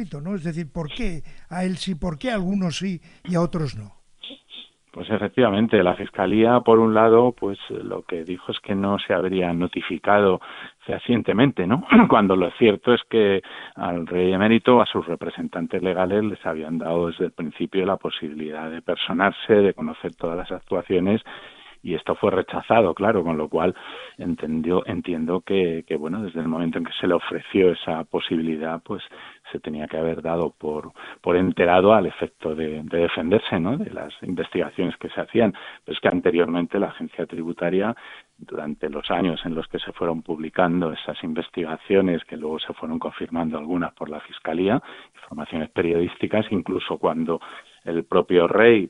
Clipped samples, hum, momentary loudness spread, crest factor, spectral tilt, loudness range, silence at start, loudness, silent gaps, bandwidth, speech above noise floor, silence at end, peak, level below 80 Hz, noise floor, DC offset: under 0.1%; none; 14 LU; 22 dB; -7 dB/octave; 8 LU; 0 s; -22 LUFS; none; 10.5 kHz; 23 dB; 0 s; 0 dBFS; -48 dBFS; -45 dBFS; under 0.1%